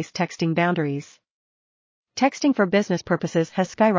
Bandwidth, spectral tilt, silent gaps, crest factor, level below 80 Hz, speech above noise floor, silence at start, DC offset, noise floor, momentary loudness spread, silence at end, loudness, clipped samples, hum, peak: 7.6 kHz; -6 dB/octave; 1.31-2.03 s; 18 dB; -62 dBFS; over 68 dB; 0 s; under 0.1%; under -90 dBFS; 7 LU; 0 s; -23 LUFS; under 0.1%; none; -4 dBFS